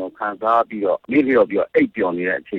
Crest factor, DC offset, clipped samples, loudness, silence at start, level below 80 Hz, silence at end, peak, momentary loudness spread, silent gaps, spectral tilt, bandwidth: 14 dB; under 0.1%; under 0.1%; -19 LUFS; 0 s; -60 dBFS; 0 s; -4 dBFS; 6 LU; none; -8.5 dB/octave; 5 kHz